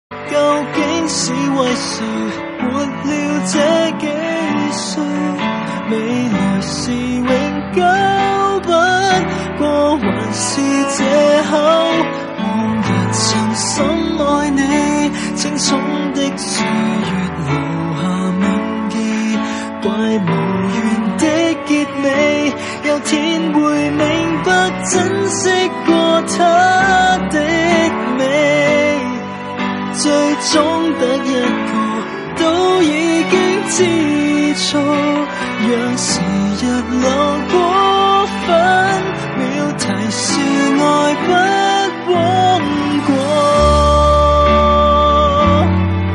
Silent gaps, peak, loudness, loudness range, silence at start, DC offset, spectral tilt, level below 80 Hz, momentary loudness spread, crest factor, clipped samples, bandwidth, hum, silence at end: none; 0 dBFS; -14 LUFS; 4 LU; 0.1 s; under 0.1%; -4.5 dB/octave; -32 dBFS; 7 LU; 14 dB; under 0.1%; 11.5 kHz; none; 0 s